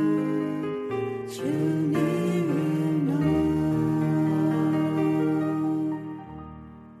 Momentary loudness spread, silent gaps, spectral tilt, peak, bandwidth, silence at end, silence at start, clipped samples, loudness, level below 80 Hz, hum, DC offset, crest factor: 12 LU; none; -8 dB/octave; -12 dBFS; 13.5 kHz; 0 s; 0 s; under 0.1%; -26 LUFS; -54 dBFS; none; under 0.1%; 14 dB